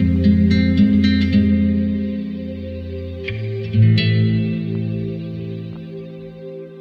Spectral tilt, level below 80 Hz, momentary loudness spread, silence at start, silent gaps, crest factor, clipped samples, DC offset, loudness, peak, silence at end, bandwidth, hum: -9 dB/octave; -36 dBFS; 18 LU; 0 s; none; 14 dB; under 0.1%; under 0.1%; -18 LUFS; -4 dBFS; 0 s; 6 kHz; none